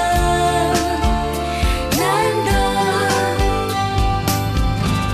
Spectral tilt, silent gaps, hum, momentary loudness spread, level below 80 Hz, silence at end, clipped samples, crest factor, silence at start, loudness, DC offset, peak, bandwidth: -4.5 dB/octave; none; none; 3 LU; -24 dBFS; 0 s; under 0.1%; 12 dB; 0 s; -18 LUFS; under 0.1%; -6 dBFS; 14 kHz